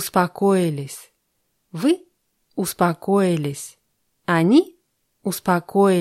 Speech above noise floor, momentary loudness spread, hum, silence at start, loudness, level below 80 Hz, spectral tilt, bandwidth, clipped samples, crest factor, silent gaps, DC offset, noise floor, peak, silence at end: 51 dB; 17 LU; none; 0 s; -20 LUFS; -64 dBFS; -6 dB/octave; 15 kHz; under 0.1%; 18 dB; none; under 0.1%; -71 dBFS; -4 dBFS; 0 s